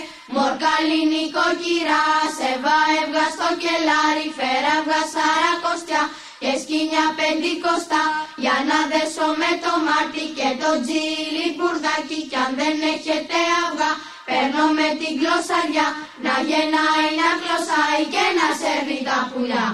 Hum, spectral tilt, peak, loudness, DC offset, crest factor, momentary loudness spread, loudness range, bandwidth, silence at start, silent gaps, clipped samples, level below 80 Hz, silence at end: none; -2 dB/octave; -4 dBFS; -20 LUFS; 0.1%; 16 dB; 5 LU; 2 LU; 12.5 kHz; 0 s; none; under 0.1%; -64 dBFS; 0 s